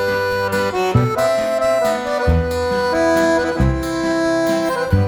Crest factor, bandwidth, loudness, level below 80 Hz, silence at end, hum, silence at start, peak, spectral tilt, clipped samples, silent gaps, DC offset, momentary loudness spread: 16 dB; 17.5 kHz; -17 LUFS; -30 dBFS; 0 s; none; 0 s; -2 dBFS; -6 dB/octave; under 0.1%; none; under 0.1%; 3 LU